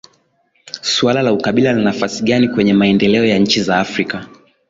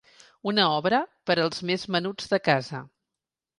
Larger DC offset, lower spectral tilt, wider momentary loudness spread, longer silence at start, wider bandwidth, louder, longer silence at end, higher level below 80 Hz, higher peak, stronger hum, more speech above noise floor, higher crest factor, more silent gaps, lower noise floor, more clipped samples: neither; about the same, -5 dB/octave vs -5 dB/octave; about the same, 9 LU vs 9 LU; first, 0.75 s vs 0.45 s; second, 7.8 kHz vs 11.5 kHz; first, -14 LUFS vs -25 LUFS; second, 0.4 s vs 0.7 s; first, -50 dBFS vs -68 dBFS; first, -2 dBFS vs -6 dBFS; neither; second, 46 dB vs 63 dB; second, 14 dB vs 20 dB; neither; second, -60 dBFS vs -88 dBFS; neither